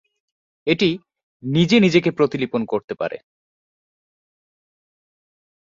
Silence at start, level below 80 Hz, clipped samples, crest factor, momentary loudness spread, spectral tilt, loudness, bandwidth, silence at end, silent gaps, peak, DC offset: 0.65 s; -60 dBFS; under 0.1%; 20 dB; 15 LU; -6.5 dB/octave; -19 LUFS; 7.6 kHz; 2.5 s; 1.23-1.40 s, 2.84-2.88 s; -2 dBFS; under 0.1%